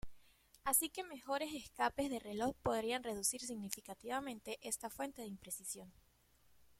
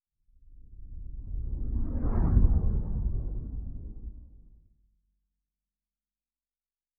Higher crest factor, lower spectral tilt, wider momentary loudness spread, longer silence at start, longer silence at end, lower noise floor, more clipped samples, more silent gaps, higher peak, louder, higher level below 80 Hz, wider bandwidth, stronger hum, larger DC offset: about the same, 24 dB vs 22 dB; second, -2.5 dB/octave vs -14 dB/octave; second, 12 LU vs 22 LU; second, 0.05 s vs 0.5 s; second, 0.05 s vs 2.5 s; second, -72 dBFS vs under -90 dBFS; neither; neither; second, -18 dBFS vs -10 dBFS; second, -41 LUFS vs -32 LUFS; second, -66 dBFS vs -32 dBFS; first, 16.5 kHz vs 2 kHz; neither; neither